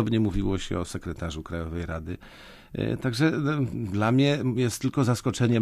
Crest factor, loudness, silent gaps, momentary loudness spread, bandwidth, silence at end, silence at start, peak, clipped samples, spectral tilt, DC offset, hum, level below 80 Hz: 16 dB; -27 LUFS; none; 12 LU; 14.5 kHz; 0 s; 0 s; -10 dBFS; under 0.1%; -6.5 dB/octave; under 0.1%; none; -42 dBFS